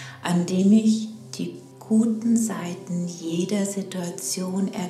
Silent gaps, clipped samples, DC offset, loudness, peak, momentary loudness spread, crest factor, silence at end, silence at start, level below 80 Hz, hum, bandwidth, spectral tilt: none; under 0.1%; under 0.1%; -24 LUFS; -8 dBFS; 14 LU; 16 dB; 0 s; 0 s; -72 dBFS; none; 14 kHz; -5.5 dB/octave